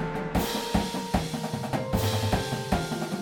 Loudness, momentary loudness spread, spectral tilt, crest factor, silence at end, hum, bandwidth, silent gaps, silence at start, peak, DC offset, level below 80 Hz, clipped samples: -28 LUFS; 4 LU; -5 dB/octave; 20 dB; 0 s; none; 17.5 kHz; none; 0 s; -8 dBFS; under 0.1%; -40 dBFS; under 0.1%